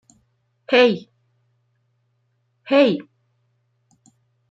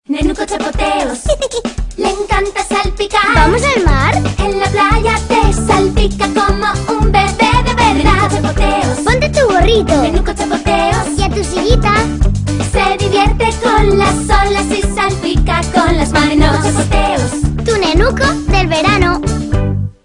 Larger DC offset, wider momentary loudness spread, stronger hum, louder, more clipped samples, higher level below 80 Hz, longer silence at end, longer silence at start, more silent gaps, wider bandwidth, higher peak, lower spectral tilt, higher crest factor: neither; first, 12 LU vs 6 LU; neither; second, -18 LUFS vs -12 LUFS; second, under 0.1% vs 0.1%; second, -74 dBFS vs -18 dBFS; first, 1.5 s vs 0.15 s; first, 0.7 s vs 0.1 s; neither; second, 7.8 kHz vs 11 kHz; about the same, -2 dBFS vs 0 dBFS; about the same, -6 dB/octave vs -5 dB/octave; first, 20 dB vs 12 dB